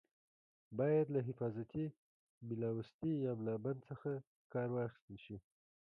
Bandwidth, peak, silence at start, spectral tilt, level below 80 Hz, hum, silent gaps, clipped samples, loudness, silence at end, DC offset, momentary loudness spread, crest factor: 5.2 kHz; -24 dBFS; 0.7 s; -11 dB/octave; -74 dBFS; none; 1.98-2.41 s, 2.94-2.99 s, 4.27-4.50 s, 5.02-5.08 s; under 0.1%; -41 LUFS; 0.45 s; under 0.1%; 17 LU; 16 dB